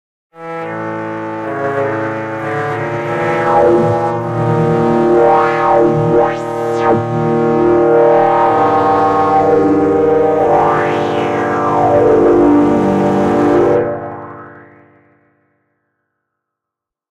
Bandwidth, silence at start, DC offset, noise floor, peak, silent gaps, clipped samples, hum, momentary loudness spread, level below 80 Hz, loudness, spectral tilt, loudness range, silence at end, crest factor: 9.6 kHz; 0.35 s; under 0.1%; -83 dBFS; 0 dBFS; none; under 0.1%; none; 12 LU; -44 dBFS; -12 LUFS; -8 dB/octave; 6 LU; 2.5 s; 12 dB